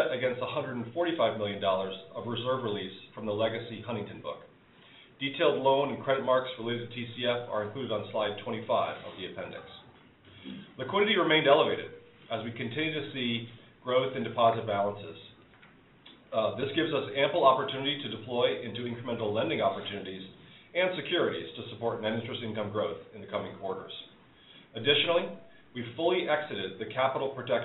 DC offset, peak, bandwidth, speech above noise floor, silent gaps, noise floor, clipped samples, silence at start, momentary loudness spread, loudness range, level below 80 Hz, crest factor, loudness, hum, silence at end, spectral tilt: under 0.1%; -8 dBFS; 4.1 kHz; 27 dB; none; -58 dBFS; under 0.1%; 0 s; 16 LU; 5 LU; -72 dBFS; 22 dB; -30 LUFS; none; 0 s; -2.5 dB/octave